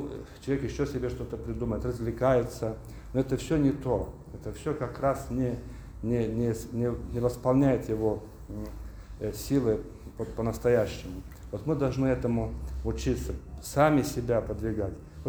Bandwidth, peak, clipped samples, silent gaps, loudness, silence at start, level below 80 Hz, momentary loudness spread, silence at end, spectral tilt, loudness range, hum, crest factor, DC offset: over 20 kHz; -10 dBFS; under 0.1%; none; -30 LUFS; 0 s; -42 dBFS; 14 LU; 0 s; -7 dB/octave; 2 LU; none; 20 dB; under 0.1%